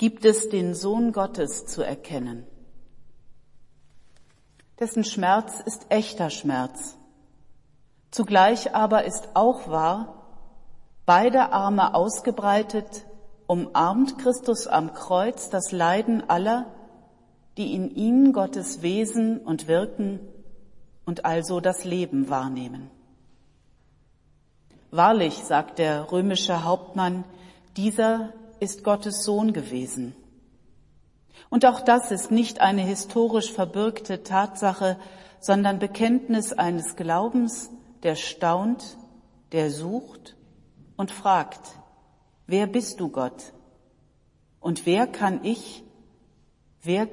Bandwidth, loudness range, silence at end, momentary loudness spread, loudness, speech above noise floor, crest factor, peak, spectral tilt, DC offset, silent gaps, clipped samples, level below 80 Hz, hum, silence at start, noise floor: 11.5 kHz; 7 LU; 0 s; 14 LU; -24 LUFS; 38 dB; 20 dB; -4 dBFS; -5 dB/octave; under 0.1%; none; under 0.1%; -58 dBFS; none; 0 s; -62 dBFS